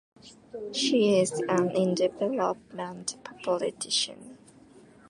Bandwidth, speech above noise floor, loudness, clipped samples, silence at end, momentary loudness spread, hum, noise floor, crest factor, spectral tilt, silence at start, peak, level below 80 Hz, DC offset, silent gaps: 11.5 kHz; 26 dB; -28 LUFS; under 0.1%; 0.75 s; 13 LU; none; -54 dBFS; 18 dB; -4 dB/octave; 0.25 s; -12 dBFS; -72 dBFS; under 0.1%; none